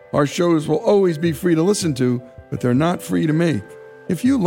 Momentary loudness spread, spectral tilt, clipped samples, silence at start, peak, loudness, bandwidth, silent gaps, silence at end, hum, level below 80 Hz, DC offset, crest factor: 10 LU; -6.5 dB/octave; under 0.1%; 0.15 s; -6 dBFS; -19 LUFS; 17 kHz; none; 0 s; none; -52 dBFS; under 0.1%; 12 dB